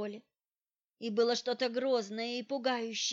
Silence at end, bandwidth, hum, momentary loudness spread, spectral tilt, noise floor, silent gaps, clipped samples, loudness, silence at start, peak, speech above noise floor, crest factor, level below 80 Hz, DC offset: 0 s; 7.8 kHz; none; 11 LU; -2.5 dB/octave; under -90 dBFS; none; under 0.1%; -34 LUFS; 0 s; -18 dBFS; over 56 dB; 16 dB; under -90 dBFS; under 0.1%